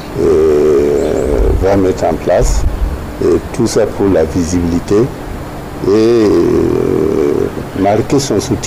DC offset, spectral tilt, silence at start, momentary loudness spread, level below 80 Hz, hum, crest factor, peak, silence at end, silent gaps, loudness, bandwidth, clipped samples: 0.4%; -6.5 dB/octave; 0 s; 9 LU; -22 dBFS; none; 8 dB; -4 dBFS; 0 s; none; -12 LUFS; 16 kHz; under 0.1%